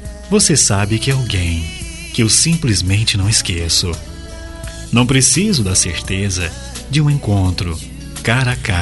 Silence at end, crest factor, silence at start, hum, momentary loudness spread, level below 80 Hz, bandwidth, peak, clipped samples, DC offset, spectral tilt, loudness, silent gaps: 0 s; 16 dB; 0 s; none; 17 LU; -32 dBFS; 12 kHz; 0 dBFS; under 0.1%; under 0.1%; -3.5 dB/octave; -14 LUFS; none